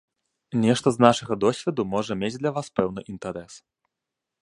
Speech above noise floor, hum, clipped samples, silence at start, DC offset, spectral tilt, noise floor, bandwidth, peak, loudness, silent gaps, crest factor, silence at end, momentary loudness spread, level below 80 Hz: 62 dB; none; under 0.1%; 0.5 s; under 0.1%; -5.5 dB/octave; -85 dBFS; 11.5 kHz; 0 dBFS; -24 LUFS; none; 24 dB; 0.9 s; 15 LU; -58 dBFS